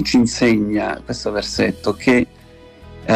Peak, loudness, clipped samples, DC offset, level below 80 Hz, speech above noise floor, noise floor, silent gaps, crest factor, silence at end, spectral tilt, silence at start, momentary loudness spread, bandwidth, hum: -4 dBFS; -18 LUFS; under 0.1%; under 0.1%; -42 dBFS; 25 dB; -43 dBFS; none; 14 dB; 0 s; -5 dB/octave; 0 s; 9 LU; 13.5 kHz; none